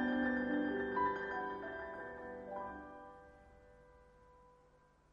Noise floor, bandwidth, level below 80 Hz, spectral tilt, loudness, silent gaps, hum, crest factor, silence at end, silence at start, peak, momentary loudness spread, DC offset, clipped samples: -68 dBFS; 7 kHz; -66 dBFS; -7.5 dB/octave; -40 LUFS; none; none; 18 dB; 0.6 s; 0 s; -24 dBFS; 19 LU; under 0.1%; under 0.1%